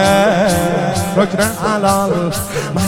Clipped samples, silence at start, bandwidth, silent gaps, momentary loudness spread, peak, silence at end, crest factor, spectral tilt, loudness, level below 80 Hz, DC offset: under 0.1%; 0 s; 17 kHz; none; 6 LU; 0 dBFS; 0 s; 14 dB; -5 dB/octave; -15 LUFS; -38 dBFS; under 0.1%